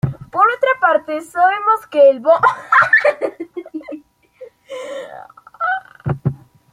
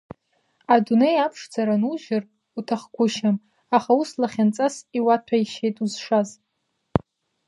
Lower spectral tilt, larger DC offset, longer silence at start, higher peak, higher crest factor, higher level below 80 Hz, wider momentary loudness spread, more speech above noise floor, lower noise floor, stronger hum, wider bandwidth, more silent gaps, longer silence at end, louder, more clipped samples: about the same, -6.5 dB/octave vs -6 dB/octave; neither; second, 0.05 s vs 0.7 s; about the same, -2 dBFS vs 0 dBFS; second, 16 dB vs 22 dB; about the same, -52 dBFS vs -56 dBFS; first, 19 LU vs 10 LU; second, 28 dB vs 53 dB; second, -41 dBFS vs -75 dBFS; neither; first, 13.5 kHz vs 11.5 kHz; neither; second, 0.35 s vs 0.5 s; first, -15 LUFS vs -23 LUFS; neither